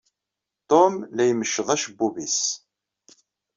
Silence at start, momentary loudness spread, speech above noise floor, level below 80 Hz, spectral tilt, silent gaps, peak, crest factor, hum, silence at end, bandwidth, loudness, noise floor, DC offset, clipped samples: 0.7 s; 8 LU; 64 dB; -70 dBFS; -3 dB/octave; none; -4 dBFS; 22 dB; none; 1 s; 7.6 kHz; -22 LUFS; -86 dBFS; under 0.1%; under 0.1%